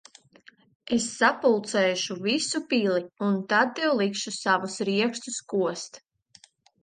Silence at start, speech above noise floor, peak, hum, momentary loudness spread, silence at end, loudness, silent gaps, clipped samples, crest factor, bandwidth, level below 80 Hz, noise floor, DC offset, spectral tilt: 0.85 s; 32 dB; -6 dBFS; none; 6 LU; 0.85 s; -25 LUFS; none; under 0.1%; 20 dB; 10 kHz; -72 dBFS; -58 dBFS; under 0.1%; -3.5 dB/octave